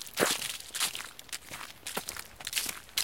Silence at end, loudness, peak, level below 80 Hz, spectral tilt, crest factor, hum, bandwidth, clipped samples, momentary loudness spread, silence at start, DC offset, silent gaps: 0 s; -34 LUFS; -8 dBFS; -64 dBFS; -0.5 dB/octave; 26 dB; none; 17 kHz; under 0.1%; 12 LU; 0 s; 0.1%; none